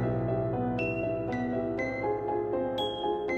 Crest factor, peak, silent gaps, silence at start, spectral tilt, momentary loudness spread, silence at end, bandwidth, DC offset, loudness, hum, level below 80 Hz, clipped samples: 14 dB; -18 dBFS; none; 0 s; -7.5 dB/octave; 1 LU; 0 s; 8.2 kHz; under 0.1%; -31 LUFS; none; -50 dBFS; under 0.1%